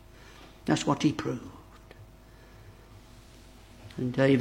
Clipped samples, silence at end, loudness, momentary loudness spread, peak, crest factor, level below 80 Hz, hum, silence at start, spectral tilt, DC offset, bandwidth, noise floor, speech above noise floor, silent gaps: under 0.1%; 0 s; -29 LUFS; 26 LU; -10 dBFS; 22 dB; -56 dBFS; none; 0.4 s; -6 dB/octave; under 0.1%; 16 kHz; -52 dBFS; 26 dB; none